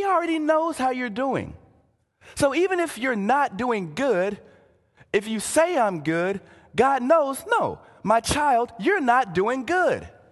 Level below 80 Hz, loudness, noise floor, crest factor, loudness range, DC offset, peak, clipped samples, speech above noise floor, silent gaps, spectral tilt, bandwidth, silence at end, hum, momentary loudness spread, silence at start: -52 dBFS; -23 LUFS; -63 dBFS; 18 dB; 3 LU; under 0.1%; -6 dBFS; under 0.1%; 40 dB; none; -4.5 dB/octave; 12.5 kHz; 0.2 s; none; 9 LU; 0 s